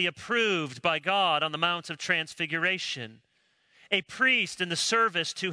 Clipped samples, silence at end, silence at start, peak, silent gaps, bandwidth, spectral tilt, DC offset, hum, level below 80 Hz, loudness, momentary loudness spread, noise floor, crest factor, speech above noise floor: under 0.1%; 0 s; 0 s; -8 dBFS; none; 11 kHz; -2.5 dB/octave; under 0.1%; none; -76 dBFS; -26 LUFS; 7 LU; -68 dBFS; 20 dB; 39 dB